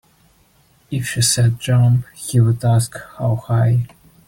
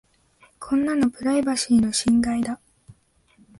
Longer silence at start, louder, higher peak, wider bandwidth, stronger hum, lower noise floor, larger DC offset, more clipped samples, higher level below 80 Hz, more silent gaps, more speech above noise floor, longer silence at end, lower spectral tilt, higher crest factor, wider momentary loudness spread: first, 0.9 s vs 0.6 s; first, -17 LUFS vs -22 LUFS; first, -4 dBFS vs -10 dBFS; first, 16.5 kHz vs 11.5 kHz; neither; second, -55 dBFS vs -59 dBFS; neither; neither; about the same, -48 dBFS vs -52 dBFS; neither; about the same, 39 dB vs 38 dB; second, 0.4 s vs 0.65 s; about the same, -5 dB/octave vs -4 dB/octave; about the same, 14 dB vs 14 dB; about the same, 10 LU vs 10 LU